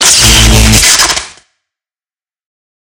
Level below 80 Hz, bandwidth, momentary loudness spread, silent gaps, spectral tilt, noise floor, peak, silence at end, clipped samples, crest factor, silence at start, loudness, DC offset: -16 dBFS; over 20 kHz; 6 LU; none; -2 dB/octave; under -90 dBFS; 0 dBFS; 1.7 s; 3%; 10 dB; 0 s; -4 LUFS; under 0.1%